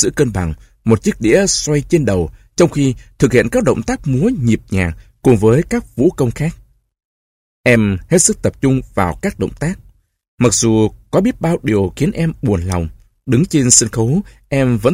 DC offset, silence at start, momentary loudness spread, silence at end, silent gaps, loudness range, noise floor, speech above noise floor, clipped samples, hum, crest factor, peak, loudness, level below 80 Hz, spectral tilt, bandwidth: under 0.1%; 0 s; 9 LU; 0 s; 7.05-7.64 s, 10.28-10.38 s; 2 LU; under -90 dBFS; over 76 dB; under 0.1%; none; 14 dB; 0 dBFS; -15 LUFS; -34 dBFS; -5 dB/octave; 16 kHz